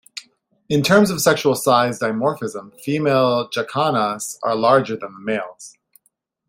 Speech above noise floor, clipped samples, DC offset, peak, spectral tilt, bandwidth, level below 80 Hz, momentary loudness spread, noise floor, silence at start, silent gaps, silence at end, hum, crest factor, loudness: 48 dB; under 0.1%; under 0.1%; -2 dBFS; -4.5 dB/octave; 16.5 kHz; -60 dBFS; 13 LU; -67 dBFS; 0.15 s; none; 0.8 s; none; 18 dB; -19 LUFS